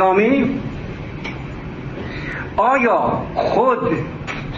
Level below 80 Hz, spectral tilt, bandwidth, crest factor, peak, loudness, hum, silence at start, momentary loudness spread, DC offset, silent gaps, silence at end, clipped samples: -40 dBFS; -7.5 dB/octave; 7.6 kHz; 16 dB; -2 dBFS; -19 LUFS; none; 0 s; 15 LU; under 0.1%; none; 0 s; under 0.1%